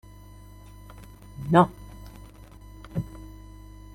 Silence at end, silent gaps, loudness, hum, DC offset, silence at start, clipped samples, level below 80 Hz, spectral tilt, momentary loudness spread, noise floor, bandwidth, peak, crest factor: 0.65 s; none; -25 LUFS; 50 Hz at -45 dBFS; under 0.1%; 1.4 s; under 0.1%; -48 dBFS; -8 dB/octave; 28 LU; -47 dBFS; 15.5 kHz; -4 dBFS; 24 dB